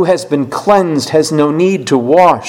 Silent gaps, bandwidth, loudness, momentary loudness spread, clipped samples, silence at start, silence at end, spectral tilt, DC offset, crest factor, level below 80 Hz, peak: none; 16.5 kHz; -12 LUFS; 5 LU; 0.7%; 0 s; 0 s; -5.5 dB/octave; under 0.1%; 10 dB; -52 dBFS; 0 dBFS